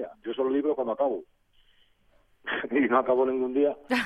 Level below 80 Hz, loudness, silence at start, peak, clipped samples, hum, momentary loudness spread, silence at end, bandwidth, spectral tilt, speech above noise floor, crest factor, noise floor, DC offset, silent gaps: -66 dBFS; -27 LUFS; 0 s; -10 dBFS; under 0.1%; none; 10 LU; 0 s; 12.5 kHz; -5.5 dB/octave; 38 dB; 18 dB; -64 dBFS; under 0.1%; none